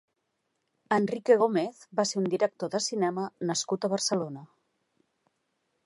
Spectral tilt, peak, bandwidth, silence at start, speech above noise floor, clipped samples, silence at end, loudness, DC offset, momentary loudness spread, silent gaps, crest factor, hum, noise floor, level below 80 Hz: -4 dB/octave; -10 dBFS; 11.5 kHz; 0.9 s; 51 dB; under 0.1%; 1.4 s; -28 LUFS; under 0.1%; 9 LU; none; 20 dB; none; -79 dBFS; -80 dBFS